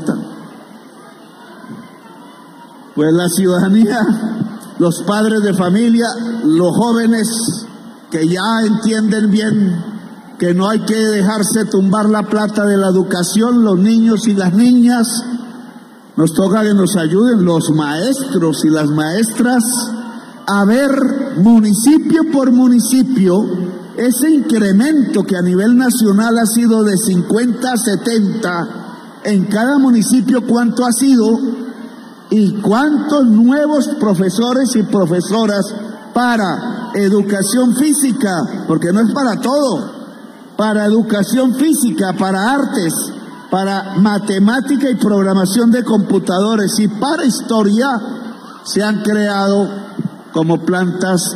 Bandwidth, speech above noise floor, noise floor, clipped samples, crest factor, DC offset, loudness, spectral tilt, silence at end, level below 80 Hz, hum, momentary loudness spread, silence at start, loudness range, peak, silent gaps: 15.5 kHz; 26 dB; -38 dBFS; under 0.1%; 10 dB; under 0.1%; -13 LUFS; -5.5 dB/octave; 0 s; -58 dBFS; none; 11 LU; 0 s; 3 LU; -2 dBFS; none